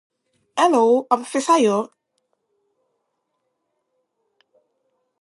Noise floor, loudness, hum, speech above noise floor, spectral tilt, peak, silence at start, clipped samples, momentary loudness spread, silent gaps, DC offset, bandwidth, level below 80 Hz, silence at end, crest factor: -74 dBFS; -18 LUFS; none; 57 dB; -4 dB/octave; -2 dBFS; 0.55 s; under 0.1%; 11 LU; none; under 0.1%; 11.5 kHz; -82 dBFS; 3.35 s; 22 dB